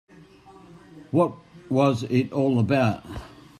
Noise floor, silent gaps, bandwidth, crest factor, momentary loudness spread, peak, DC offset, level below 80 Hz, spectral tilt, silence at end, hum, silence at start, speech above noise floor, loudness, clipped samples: -50 dBFS; none; 13 kHz; 18 dB; 12 LU; -8 dBFS; under 0.1%; -54 dBFS; -8 dB/octave; 0.35 s; none; 0.95 s; 27 dB; -23 LUFS; under 0.1%